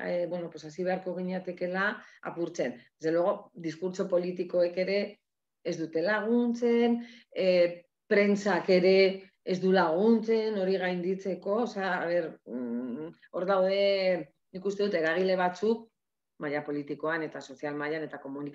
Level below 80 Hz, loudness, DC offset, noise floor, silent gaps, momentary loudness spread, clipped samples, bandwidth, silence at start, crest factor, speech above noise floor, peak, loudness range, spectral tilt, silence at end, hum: -82 dBFS; -29 LUFS; under 0.1%; -59 dBFS; none; 13 LU; under 0.1%; 7.8 kHz; 0 s; 18 dB; 31 dB; -10 dBFS; 6 LU; -6 dB/octave; 0 s; none